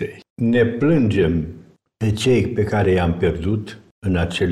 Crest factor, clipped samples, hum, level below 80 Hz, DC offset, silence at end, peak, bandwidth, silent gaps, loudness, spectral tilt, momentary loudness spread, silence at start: 14 dB; under 0.1%; none; -38 dBFS; under 0.1%; 0 s; -6 dBFS; 12.5 kHz; 0.30-0.36 s, 3.91-4.02 s; -19 LUFS; -7 dB/octave; 10 LU; 0 s